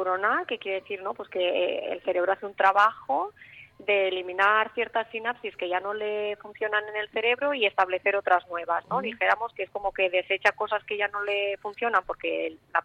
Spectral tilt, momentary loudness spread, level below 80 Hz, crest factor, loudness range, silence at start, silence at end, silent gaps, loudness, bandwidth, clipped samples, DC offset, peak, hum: -4 dB/octave; 9 LU; -66 dBFS; 20 dB; 2 LU; 0 s; 0 s; none; -27 LUFS; 9.2 kHz; under 0.1%; under 0.1%; -8 dBFS; none